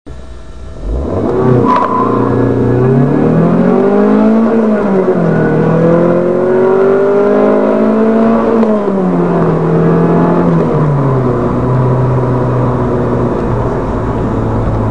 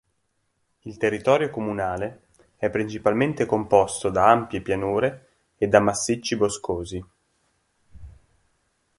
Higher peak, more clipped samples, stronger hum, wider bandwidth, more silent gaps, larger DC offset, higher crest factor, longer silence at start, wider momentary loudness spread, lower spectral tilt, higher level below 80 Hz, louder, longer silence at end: about the same, 0 dBFS vs -2 dBFS; first, 0.2% vs under 0.1%; neither; second, 9.2 kHz vs 11.5 kHz; neither; first, 4% vs under 0.1%; second, 10 dB vs 24 dB; second, 0.05 s vs 0.85 s; second, 5 LU vs 11 LU; first, -10 dB/octave vs -5 dB/octave; first, -28 dBFS vs -50 dBFS; first, -10 LUFS vs -23 LUFS; second, 0 s vs 0.9 s